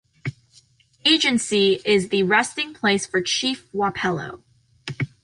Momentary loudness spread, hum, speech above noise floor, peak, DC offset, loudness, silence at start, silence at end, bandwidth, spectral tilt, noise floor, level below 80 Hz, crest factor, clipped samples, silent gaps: 16 LU; none; 35 dB; -4 dBFS; under 0.1%; -20 LUFS; 0.25 s; 0.15 s; 11.5 kHz; -3.5 dB/octave; -56 dBFS; -58 dBFS; 18 dB; under 0.1%; none